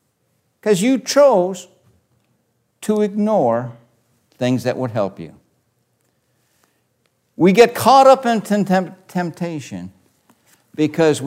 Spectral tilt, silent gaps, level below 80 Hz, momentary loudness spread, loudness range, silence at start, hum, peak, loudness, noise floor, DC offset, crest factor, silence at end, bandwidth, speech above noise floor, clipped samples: -5.5 dB/octave; none; -66 dBFS; 21 LU; 10 LU; 0.65 s; none; 0 dBFS; -16 LUFS; -66 dBFS; under 0.1%; 18 dB; 0 s; 16 kHz; 50 dB; under 0.1%